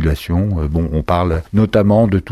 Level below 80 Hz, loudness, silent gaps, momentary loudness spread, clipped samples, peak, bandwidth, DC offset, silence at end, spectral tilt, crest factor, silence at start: -26 dBFS; -16 LUFS; none; 6 LU; under 0.1%; -2 dBFS; 13.5 kHz; under 0.1%; 0 s; -8.5 dB/octave; 14 dB; 0 s